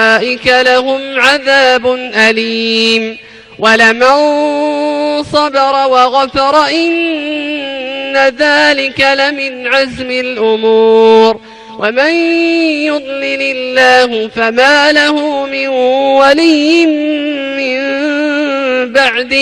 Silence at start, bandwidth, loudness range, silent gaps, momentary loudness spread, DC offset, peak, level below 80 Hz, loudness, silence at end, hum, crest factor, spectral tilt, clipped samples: 0 s; 11.5 kHz; 2 LU; none; 9 LU; under 0.1%; 0 dBFS; -48 dBFS; -10 LUFS; 0 s; none; 10 dB; -3 dB/octave; 0.3%